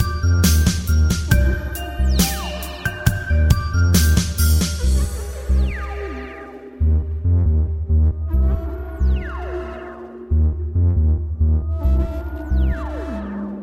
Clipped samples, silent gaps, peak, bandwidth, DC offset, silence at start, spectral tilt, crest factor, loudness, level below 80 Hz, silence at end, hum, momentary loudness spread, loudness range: under 0.1%; none; 0 dBFS; 17 kHz; under 0.1%; 0 s; -5.5 dB/octave; 18 dB; -20 LUFS; -20 dBFS; 0 s; none; 12 LU; 3 LU